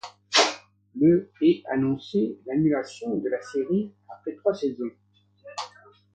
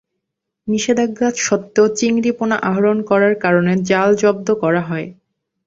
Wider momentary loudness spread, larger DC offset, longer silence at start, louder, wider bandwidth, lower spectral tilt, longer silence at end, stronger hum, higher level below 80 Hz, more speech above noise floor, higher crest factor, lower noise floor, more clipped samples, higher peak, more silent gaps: first, 16 LU vs 6 LU; neither; second, 0.05 s vs 0.65 s; second, -25 LUFS vs -16 LUFS; first, 9.2 kHz vs 7.8 kHz; about the same, -4.5 dB/octave vs -5 dB/octave; about the same, 0.45 s vs 0.55 s; first, 50 Hz at -50 dBFS vs none; second, -66 dBFS vs -58 dBFS; second, 26 dB vs 62 dB; first, 22 dB vs 14 dB; second, -50 dBFS vs -78 dBFS; neither; about the same, -4 dBFS vs -2 dBFS; neither